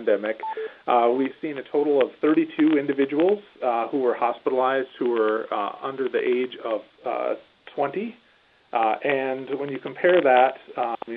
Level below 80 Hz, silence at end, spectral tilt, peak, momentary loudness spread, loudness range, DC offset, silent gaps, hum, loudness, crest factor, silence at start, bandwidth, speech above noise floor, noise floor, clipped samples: -78 dBFS; 0 s; -8.5 dB/octave; -4 dBFS; 10 LU; 5 LU; under 0.1%; none; none; -24 LUFS; 18 dB; 0 s; 4.7 kHz; 36 dB; -59 dBFS; under 0.1%